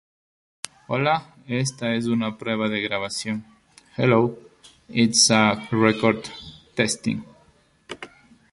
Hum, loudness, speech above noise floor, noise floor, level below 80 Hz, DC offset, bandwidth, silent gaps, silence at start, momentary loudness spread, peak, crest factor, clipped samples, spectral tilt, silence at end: none; -22 LUFS; 37 dB; -59 dBFS; -58 dBFS; under 0.1%; 11.5 kHz; none; 0.9 s; 20 LU; -2 dBFS; 22 dB; under 0.1%; -4 dB/octave; 0.45 s